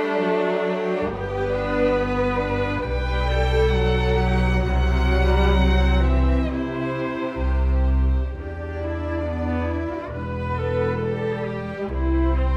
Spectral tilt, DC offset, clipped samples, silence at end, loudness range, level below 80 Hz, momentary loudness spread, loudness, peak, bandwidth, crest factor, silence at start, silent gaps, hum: -8 dB/octave; under 0.1%; under 0.1%; 0 s; 6 LU; -24 dBFS; 8 LU; -23 LUFS; -8 dBFS; 7.2 kHz; 14 dB; 0 s; none; none